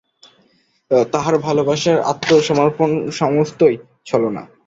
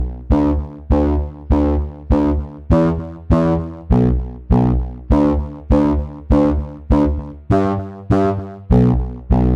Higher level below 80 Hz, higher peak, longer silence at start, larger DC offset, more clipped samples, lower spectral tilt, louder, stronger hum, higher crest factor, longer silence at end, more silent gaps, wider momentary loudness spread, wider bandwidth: second, -56 dBFS vs -22 dBFS; about the same, -2 dBFS vs -2 dBFS; first, 0.9 s vs 0 s; neither; neither; second, -5.5 dB/octave vs -10 dB/octave; about the same, -17 LUFS vs -18 LUFS; neither; about the same, 16 dB vs 14 dB; first, 0.2 s vs 0 s; neither; about the same, 5 LU vs 7 LU; first, 8 kHz vs 6.6 kHz